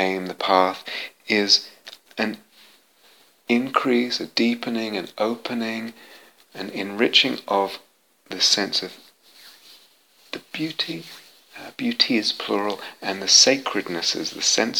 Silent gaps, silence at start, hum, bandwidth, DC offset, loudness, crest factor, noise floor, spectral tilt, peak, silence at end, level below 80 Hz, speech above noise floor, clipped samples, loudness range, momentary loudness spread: none; 0 s; none; 18.5 kHz; under 0.1%; -21 LUFS; 24 dB; -56 dBFS; -1.5 dB/octave; 0 dBFS; 0 s; -76 dBFS; 33 dB; under 0.1%; 6 LU; 20 LU